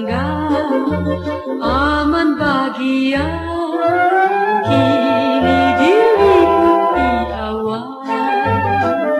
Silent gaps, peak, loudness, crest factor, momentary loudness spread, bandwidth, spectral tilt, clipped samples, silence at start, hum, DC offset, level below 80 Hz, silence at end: none; -2 dBFS; -15 LUFS; 12 dB; 10 LU; 12.5 kHz; -7 dB/octave; under 0.1%; 0 s; none; under 0.1%; -36 dBFS; 0 s